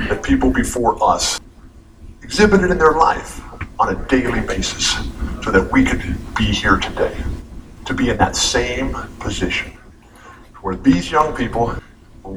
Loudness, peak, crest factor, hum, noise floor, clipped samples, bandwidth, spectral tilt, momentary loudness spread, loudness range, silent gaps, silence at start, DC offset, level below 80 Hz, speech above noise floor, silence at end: -17 LUFS; 0 dBFS; 18 dB; none; -42 dBFS; under 0.1%; 15 kHz; -4 dB/octave; 14 LU; 4 LU; none; 0 s; under 0.1%; -30 dBFS; 26 dB; 0 s